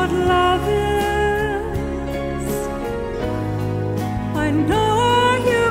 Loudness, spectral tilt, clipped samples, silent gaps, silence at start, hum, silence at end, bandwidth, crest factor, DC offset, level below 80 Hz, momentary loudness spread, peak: -20 LUFS; -5.5 dB/octave; under 0.1%; none; 0 s; none; 0 s; 16 kHz; 14 dB; under 0.1%; -32 dBFS; 9 LU; -6 dBFS